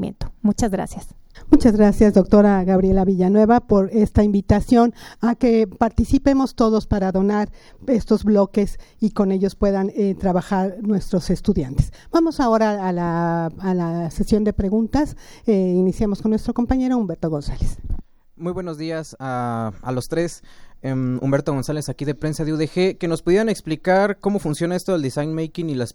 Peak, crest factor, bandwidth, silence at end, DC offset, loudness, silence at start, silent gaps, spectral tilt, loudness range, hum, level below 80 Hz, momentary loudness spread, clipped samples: 0 dBFS; 18 dB; 12.5 kHz; 0.05 s; under 0.1%; -20 LUFS; 0 s; none; -7.5 dB/octave; 9 LU; none; -32 dBFS; 12 LU; under 0.1%